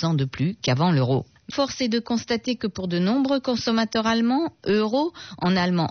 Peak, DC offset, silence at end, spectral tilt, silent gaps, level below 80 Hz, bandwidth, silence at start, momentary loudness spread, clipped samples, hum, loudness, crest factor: -10 dBFS; under 0.1%; 0 s; -5 dB/octave; none; -58 dBFS; 6.6 kHz; 0 s; 6 LU; under 0.1%; none; -23 LUFS; 12 dB